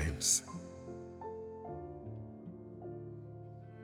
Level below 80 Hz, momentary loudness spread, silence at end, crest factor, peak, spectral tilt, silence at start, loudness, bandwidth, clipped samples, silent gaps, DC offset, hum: -54 dBFS; 20 LU; 0 s; 26 dB; -16 dBFS; -3 dB/octave; 0 s; -39 LUFS; 19 kHz; under 0.1%; none; under 0.1%; none